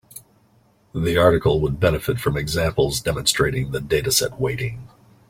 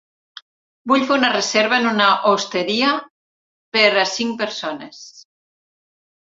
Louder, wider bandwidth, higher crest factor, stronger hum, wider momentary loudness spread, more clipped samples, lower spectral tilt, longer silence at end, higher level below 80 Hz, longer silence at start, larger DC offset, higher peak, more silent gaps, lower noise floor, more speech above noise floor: second, -20 LUFS vs -17 LUFS; first, 16.5 kHz vs 7.8 kHz; about the same, 20 dB vs 20 dB; neither; second, 9 LU vs 13 LU; neither; first, -4.5 dB/octave vs -2.5 dB/octave; second, 0.4 s vs 1.1 s; first, -38 dBFS vs -68 dBFS; second, 0.15 s vs 0.85 s; neither; about the same, -2 dBFS vs 0 dBFS; second, none vs 3.10-3.72 s; second, -58 dBFS vs under -90 dBFS; second, 38 dB vs over 72 dB